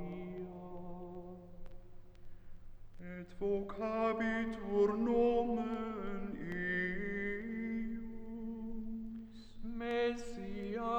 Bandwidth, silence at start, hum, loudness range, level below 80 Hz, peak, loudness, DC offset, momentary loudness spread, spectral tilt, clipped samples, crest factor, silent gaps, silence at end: 8.6 kHz; 0 s; none; 10 LU; -52 dBFS; -20 dBFS; -38 LUFS; under 0.1%; 17 LU; -7 dB/octave; under 0.1%; 18 dB; none; 0 s